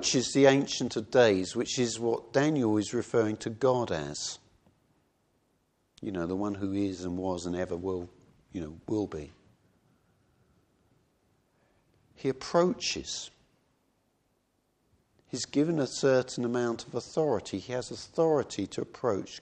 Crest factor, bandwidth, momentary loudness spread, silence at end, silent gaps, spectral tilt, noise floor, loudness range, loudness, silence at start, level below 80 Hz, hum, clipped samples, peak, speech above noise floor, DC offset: 22 dB; 9.6 kHz; 13 LU; 0 s; none; -4.5 dB/octave; -74 dBFS; 12 LU; -30 LUFS; 0 s; -64 dBFS; none; under 0.1%; -8 dBFS; 45 dB; under 0.1%